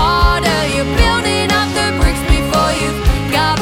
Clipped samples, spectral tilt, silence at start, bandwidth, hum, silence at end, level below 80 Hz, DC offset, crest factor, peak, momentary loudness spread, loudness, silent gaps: under 0.1%; -4.5 dB/octave; 0 s; 17 kHz; none; 0 s; -18 dBFS; under 0.1%; 12 dB; 0 dBFS; 3 LU; -14 LUFS; none